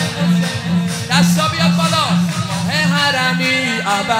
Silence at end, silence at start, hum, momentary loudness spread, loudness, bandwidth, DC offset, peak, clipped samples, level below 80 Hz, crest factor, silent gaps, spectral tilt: 0 s; 0 s; none; 5 LU; -15 LUFS; 16 kHz; under 0.1%; 0 dBFS; under 0.1%; -50 dBFS; 16 dB; none; -4.5 dB/octave